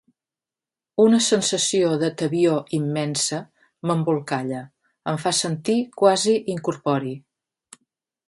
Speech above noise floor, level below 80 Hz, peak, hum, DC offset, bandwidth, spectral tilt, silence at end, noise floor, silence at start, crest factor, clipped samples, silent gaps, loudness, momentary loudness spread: over 69 dB; -68 dBFS; -2 dBFS; none; under 0.1%; 11.5 kHz; -4.5 dB/octave; 1.1 s; under -90 dBFS; 1 s; 20 dB; under 0.1%; none; -22 LUFS; 13 LU